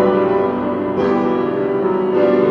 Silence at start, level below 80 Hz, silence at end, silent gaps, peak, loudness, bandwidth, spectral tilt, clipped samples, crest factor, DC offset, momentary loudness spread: 0 s; -50 dBFS; 0 s; none; -4 dBFS; -17 LUFS; 5.6 kHz; -9 dB/octave; under 0.1%; 12 dB; under 0.1%; 4 LU